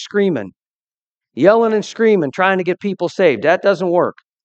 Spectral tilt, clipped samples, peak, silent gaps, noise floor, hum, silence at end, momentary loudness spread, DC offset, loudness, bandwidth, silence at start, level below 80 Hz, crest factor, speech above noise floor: -6 dB/octave; under 0.1%; 0 dBFS; 0.67-0.88 s, 0.94-1.15 s; under -90 dBFS; none; 0.35 s; 9 LU; under 0.1%; -16 LUFS; 8.2 kHz; 0 s; -68 dBFS; 16 dB; over 75 dB